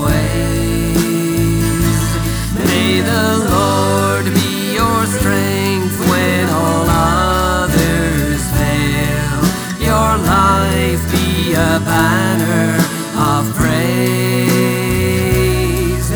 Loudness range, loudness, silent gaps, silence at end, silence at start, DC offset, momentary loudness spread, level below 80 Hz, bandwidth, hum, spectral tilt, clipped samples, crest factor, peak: 1 LU; -14 LUFS; none; 0 s; 0 s; under 0.1%; 3 LU; -26 dBFS; over 20 kHz; none; -5 dB/octave; under 0.1%; 12 dB; -2 dBFS